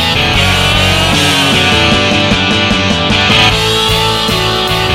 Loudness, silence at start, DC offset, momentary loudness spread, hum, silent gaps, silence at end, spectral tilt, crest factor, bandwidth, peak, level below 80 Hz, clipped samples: -9 LUFS; 0 s; under 0.1%; 3 LU; none; none; 0 s; -3.5 dB/octave; 10 dB; 17 kHz; 0 dBFS; -26 dBFS; under 0.1%